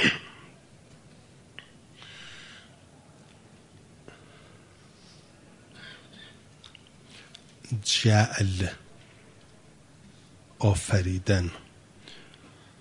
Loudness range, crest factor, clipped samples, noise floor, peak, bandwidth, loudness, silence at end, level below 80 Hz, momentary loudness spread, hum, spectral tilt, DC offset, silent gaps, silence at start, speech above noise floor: 22 LU; 24 dB; under 0.1%; -55 dBFS; -6 dBFS; 11 kHz; -26 LUFS; 0.6 s; -58 dBFS; 28 LU; none; -4.5 dB/octave; under 0.1%; none; 0 s; 30 dB